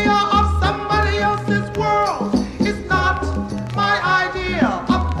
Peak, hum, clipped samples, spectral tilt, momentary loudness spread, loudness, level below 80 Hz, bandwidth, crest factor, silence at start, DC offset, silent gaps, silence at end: -4 dBFS; none; under 0.1%; -6 dB/octave; 5 LU; -19 LUFS; -28 dBFS; 11.5 kHz; 14 dB; 0 s; under 0.1%; none; 0 s